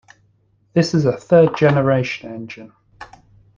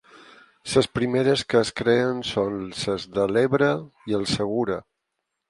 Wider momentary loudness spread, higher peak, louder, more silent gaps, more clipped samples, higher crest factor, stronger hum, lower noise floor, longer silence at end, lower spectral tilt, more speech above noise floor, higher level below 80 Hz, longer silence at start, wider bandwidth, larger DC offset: first, 18 LU vs 8 LU; about the same, -2 dBFS vs -4 dBFS; first, -17 LUFS vs -23 LUFS; neither; neither; about the same, 18 dB vs 20 dB; neither; second, -60 dBFS vs -80 dBFS; second, 0.5 s vs 0.7 s; first, -7 dB/octave vs -5 dB/octave; second, 43 dB vs 57 dB; about the same, -52 dBFS vs -54 dBFS; about the same, 0.75 s vs 0.65 s; second, 7.4 kHz vs 11.5 kHz; neither